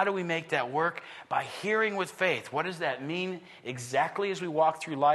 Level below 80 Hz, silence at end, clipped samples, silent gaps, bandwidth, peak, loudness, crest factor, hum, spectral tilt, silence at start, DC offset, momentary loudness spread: -78 dBFS; 0 s; under 0.1%; none; 12.5 kHz; -12 dBFS; -30 LUFS; 18 dB; none; -4.5 dB/octave; 0 s; under 0.1%; 7 LU